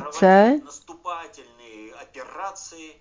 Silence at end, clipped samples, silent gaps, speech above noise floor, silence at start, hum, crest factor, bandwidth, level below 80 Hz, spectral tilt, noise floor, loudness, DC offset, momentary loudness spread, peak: 0.15 s; under 0.1%; none; 28 dB; 0 s; none; 20 dB; 7.6 kHz; -66 dBFS; -6 dB/octave; -46 dBFS; -16 LUFS; under 0.1%; 27 LU; -2 dBFS